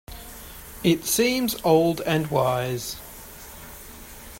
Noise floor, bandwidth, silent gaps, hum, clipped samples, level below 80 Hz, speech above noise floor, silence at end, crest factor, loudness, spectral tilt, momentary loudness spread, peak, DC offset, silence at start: -42 dBFS; 16.5 kHz; none; none; under 0.1%; -48 dBFS; 20 dB; 0 s; 20 dB; -23 LUFS; -4.5 dB/octave; 20 LU; -6 dBFS; under 0.1%; 0.1 s